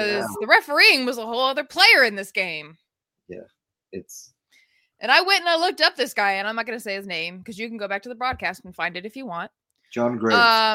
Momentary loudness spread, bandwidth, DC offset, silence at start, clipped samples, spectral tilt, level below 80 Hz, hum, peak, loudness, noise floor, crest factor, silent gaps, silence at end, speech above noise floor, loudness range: 19 LU; 16.5 kHz; under 0.1%; 0 s; under 0.1%; -2.5 dB/octave; -62 dBFS; none; 0 dBFS; -19 LUFS; -62 dBFS; 22 dB; none; 0 s; 40 dB; 10 LU